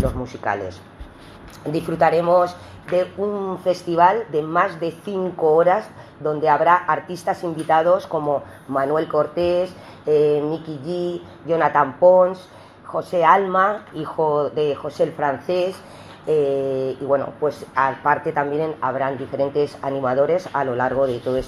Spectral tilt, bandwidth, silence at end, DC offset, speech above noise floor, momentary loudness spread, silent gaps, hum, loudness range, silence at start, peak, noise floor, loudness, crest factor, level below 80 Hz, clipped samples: -7 dB/octave; 12.5 kHz; 0 s; under 0.1%; 21 dB; 12 LU; none; none; 4 LU; 0 s; -2 dBFS; -41 dBFS; -20 LUFS; 18 dB; -48 dBFS; under 0.1%